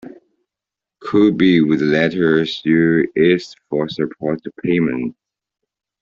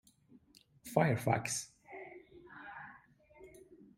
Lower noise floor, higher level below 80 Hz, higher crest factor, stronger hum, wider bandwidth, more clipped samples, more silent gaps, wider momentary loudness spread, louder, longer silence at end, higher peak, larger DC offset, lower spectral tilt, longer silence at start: first, -86 dBFS vs -65 dBFS; first, -56 dBFS vs -72 dBFS; second, 16 dB vs 26 dB; neither; second, 7.2 kHz vs 16 kHz; neither; neither; second, 10 LU vs 26 LU; first, -17 LUFS vs -35 LUFS; first, 0.9 s vs 0.25 s; first, -2 dBFS vs -14 dBFS; neither; first, -7.5 dB/octave vs -5 dB/octave; second, 0.05 s vs 0.85 s